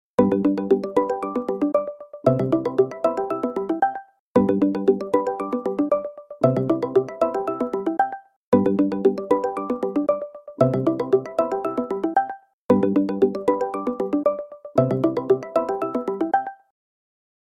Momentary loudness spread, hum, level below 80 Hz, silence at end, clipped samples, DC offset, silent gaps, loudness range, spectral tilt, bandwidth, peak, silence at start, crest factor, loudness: 6 LU; none; -58 dBFS; 1.05 s; under 0.1%; under 0.1%; 4.19-4.35 s, 8.36-8.52 s, 12.53-12.69 s; 2 LU; -9 dB/octave; 10 kHz; -4 dBFS; 0.2 s; 20 dB; -22 LUFS